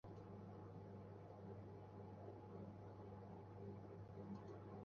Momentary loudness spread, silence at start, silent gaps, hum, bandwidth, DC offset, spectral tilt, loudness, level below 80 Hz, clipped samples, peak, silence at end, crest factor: 3 LU; 0.05 s; none; none; 6.6 kHz; under 0.1%; -9 dB/octave; -57 LUFS; -74 dBFS; under 0.1%; -42 dBFS; 0 s; 14 dB